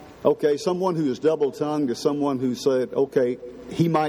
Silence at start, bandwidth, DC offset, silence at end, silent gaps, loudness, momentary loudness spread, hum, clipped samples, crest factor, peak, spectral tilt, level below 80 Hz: 0 s; 15 kHz; under 0.1%; 0 s; none; -23 LUFS; 3 LU; none; under 0.1%; 18 dB; -6 dBFS; -6.5 dB/octave; -62 dBFS